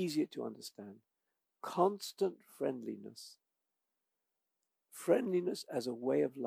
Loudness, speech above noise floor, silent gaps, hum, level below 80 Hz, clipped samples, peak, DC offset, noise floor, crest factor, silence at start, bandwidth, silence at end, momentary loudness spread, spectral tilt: -37 LUFS; 52 dB; none; none; under -90 dBFS; under 0.1%; -16 dBFS; under 0.1%; -88 dBFS; 22 dB; 0 s; 16 kHz; 0 s; 19 LU; -5.5 dB/octave